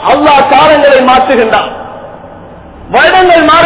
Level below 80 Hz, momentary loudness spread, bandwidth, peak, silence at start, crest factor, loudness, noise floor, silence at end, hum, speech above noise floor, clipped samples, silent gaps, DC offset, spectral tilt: -36 dBFS; 17 LU; 4 kHz; 0 dBFS; 0 s; 6 dB; -5 LUFS; -29 dBFS; 0 s; none; 24 dB; 4%; none; under 0.1%; -8 dB/octave